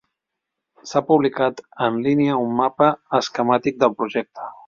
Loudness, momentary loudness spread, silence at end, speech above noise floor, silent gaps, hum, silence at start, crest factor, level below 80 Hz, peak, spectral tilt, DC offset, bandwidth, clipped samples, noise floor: -20 LUFS; 7 LU; 0.15 s; 62 dB; none; none; 0.85 s; 18 dB; -62 dBFS; -2 dBFS; -6 dB/octave; under 0.1%; 7.4 kHz; under 0.1%; -82 dBFS